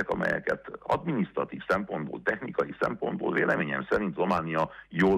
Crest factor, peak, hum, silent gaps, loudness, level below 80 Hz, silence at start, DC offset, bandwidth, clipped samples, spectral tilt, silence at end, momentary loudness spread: 16 dB; -12 dBFS; none; none; -29 LUFS; -56 dBFS; 0 s; under 0.1%; 11.5 kHz; under 0.1%; -7.5 dB/octave; 0 s; 5 LU